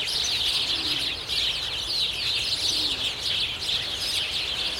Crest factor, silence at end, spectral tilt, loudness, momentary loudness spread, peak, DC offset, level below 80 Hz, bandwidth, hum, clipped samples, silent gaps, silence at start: 14 dB; 0 s; -0.5 dB/octave; -24 LUFS; 3 LU; -12 dBFS; under 0.1%; -50 dBFS; 16.5 kHz; none; under 0.1%; none; 0 s